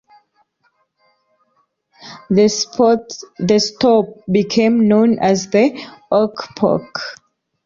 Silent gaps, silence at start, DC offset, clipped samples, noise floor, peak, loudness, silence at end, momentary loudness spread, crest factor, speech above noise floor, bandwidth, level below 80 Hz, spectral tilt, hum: none; 2.05 s; under 0.1%; under 0.1%; -64 dBFS; -2 dBFS; -16 LUFS; 0.5 s; 14 LU; 14 dB; 49 dB; 7.6 kHz; -56 dBFS; -5 dB/octave; none